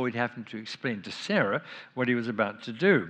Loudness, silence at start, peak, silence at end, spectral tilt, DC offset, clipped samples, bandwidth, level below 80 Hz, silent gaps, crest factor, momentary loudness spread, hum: -30 LUFS; 0 s; -10 dBFS; 0 s; -6 dB/octave; under 0.1%; under 0.1%; 9.2 kHz; -84 dBFS; none; 18 dB; 10 LU; none